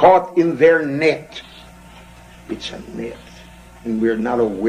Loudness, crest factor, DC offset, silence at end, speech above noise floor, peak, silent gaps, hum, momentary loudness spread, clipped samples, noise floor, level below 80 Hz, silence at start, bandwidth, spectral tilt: -18 LUFS; 18 dB; under 0.1%; 0 s; 25 dB; 0 dBFS; none; none; 21 LU; under 0.1%; -42 dBFS; -48 dBFS; 0 s; 10.5 kHz; -6 dB/octave